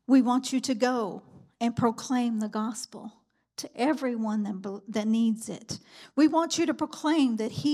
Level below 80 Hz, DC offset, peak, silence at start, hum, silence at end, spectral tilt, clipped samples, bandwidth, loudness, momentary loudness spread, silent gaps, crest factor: -70 dBFS; under 0.1%; -10 dBFS; 0.1 s; none; 0 s; -4.5 dB/octave; under 0.1%; 14.5 kHz; -28 LUFS; 16 LU; none; 16 dB